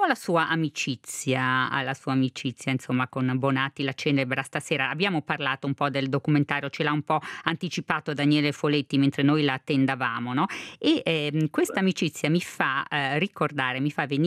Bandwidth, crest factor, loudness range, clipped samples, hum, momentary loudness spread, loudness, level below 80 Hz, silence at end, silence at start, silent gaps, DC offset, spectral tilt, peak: 15 kHz; 22 dB; 2 LU; under 0.1%; none; 5 LU; -26 LUFS; -72 dBFS; 0 s; 0 s; none; under 0.1%; -5.5 dB/octave; -4 dBFS